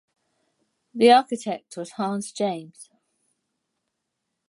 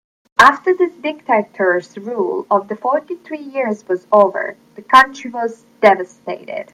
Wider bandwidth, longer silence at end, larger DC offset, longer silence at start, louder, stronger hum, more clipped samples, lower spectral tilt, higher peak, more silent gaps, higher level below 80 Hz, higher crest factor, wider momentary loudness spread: second, 11.5 kHz vs 15.5 kHz; first, 1.65 s vs 0.1 s; neither; first, 0.95 s vs 0.4 s; second, -22 LUFS vs -16 LUFS; neither; neither; about the same, -4.5 dB/octave vs -4.5 dB/octave; second, -4 dBFS vs 0 dBFS; neither; second, -80 dBFS vs -58 dBFS; first, 22 dB vs 16 dB; first, 19 LU vs 16 LU